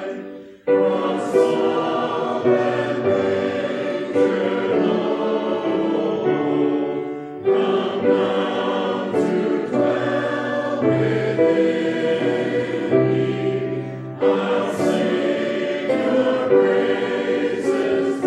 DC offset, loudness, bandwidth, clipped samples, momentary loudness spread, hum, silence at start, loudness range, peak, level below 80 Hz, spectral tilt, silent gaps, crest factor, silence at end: under 0.1%; -20 LUFS; 11 kHz; under 0.1%; 5 LU; none; 0 s; 1 LU; -4 dBFS; -68 dBFS; -6.5 dB/octave; none; 16 dB; 0 s